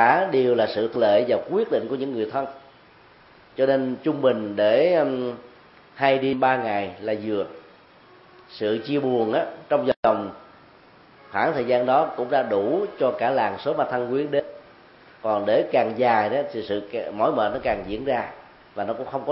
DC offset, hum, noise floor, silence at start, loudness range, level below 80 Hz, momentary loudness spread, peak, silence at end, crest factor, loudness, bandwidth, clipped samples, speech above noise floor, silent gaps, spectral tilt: under 0.1%; none; -52 dBFS; 0 s; 3 LU; -60 dBFS; 10 LU; -2 dBFS; 0 s; 20 dB; -23 LUFS; 5.8 kHz; under 0.1%; 30 dB; 9.96-10.03 s; -10 dB/octave